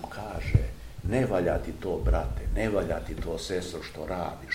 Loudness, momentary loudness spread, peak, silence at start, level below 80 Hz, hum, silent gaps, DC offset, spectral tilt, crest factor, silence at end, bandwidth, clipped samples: -30 LUFS; 10 LU; -6 dBFS; 0 s; -34 dBFS; none; none; 0.2%; -6.5 dB/octave; 22 dB; 0 s; 16 kHz; under 0.1%